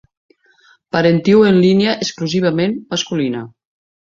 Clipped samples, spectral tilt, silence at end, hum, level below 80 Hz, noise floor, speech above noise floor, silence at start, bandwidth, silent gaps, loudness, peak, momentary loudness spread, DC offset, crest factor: under 0.1%; -6 dB/octave; 0.65 s; none; -54 dBFS; -53 dBFS; 38 dB; 0.95 s; 7.6 kHz; none; -15 LUFS; -2 dBFS; 11 LU; under 0.1%; 14 dB